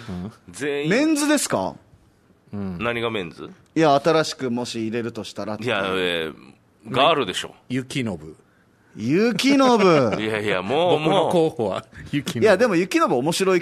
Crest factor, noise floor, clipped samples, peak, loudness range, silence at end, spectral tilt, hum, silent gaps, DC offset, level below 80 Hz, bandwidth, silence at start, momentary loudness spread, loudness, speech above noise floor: 18 dB; -57 dBFS; under 0.1%; -4 dBFS; 5 LU; 0 s; -4.5 dB/octave; none; none; under 0.1%; -58 dBFS; 13.5 kHz; 0 s; 14 LU; -21 LUFS; 36 dB